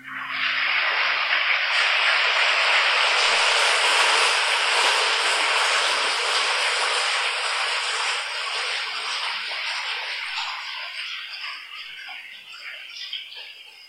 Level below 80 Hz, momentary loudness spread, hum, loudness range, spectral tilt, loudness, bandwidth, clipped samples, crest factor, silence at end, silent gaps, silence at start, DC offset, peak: -82 dBFS; 17 LU; none; 12 LU; 3 dB/octave; -20 LUFS; 16 kHz; under 0.1%; 18 dB; 0 s; none; 0 s; under 0.1%; -6 dBFS